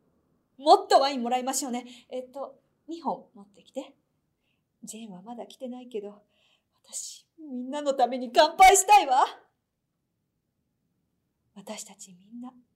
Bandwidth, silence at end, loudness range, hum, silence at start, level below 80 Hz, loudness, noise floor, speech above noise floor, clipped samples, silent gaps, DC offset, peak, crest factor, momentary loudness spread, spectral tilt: 16 kHz; 0.25 s; 20 LU; none; 0.6 s; -60 dBFS; -22 LUFS; -80 dBFS; 54 dB; under 0.1%; none; under 0.1%; -6 dBFS; 22 dB; 24 LU; -1.5 dB/octave